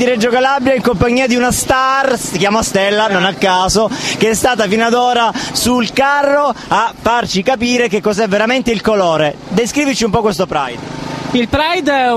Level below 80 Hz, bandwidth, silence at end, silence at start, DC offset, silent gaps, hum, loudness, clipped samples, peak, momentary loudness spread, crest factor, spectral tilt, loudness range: -38 dBFS; 15 kHz; 0 s; 0 s; under 0.1%; none; none; -13 LUFS; under 0.1%; 0 dBFS; 4 LU; 14 dB; -3.5 dB/octave; 2 LU